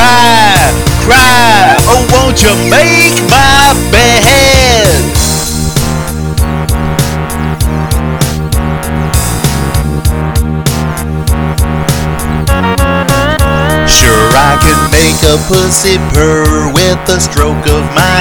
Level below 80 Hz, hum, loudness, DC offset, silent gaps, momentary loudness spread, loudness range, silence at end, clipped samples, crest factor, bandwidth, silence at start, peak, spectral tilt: -16 dBFS; none; -7 LUFS; under 0.1%; none; 9 LU; 7 LU; 0 s; 2%; 8 dB; over 20 kHz; 0 s; 0 dBFS; -4 dB/octave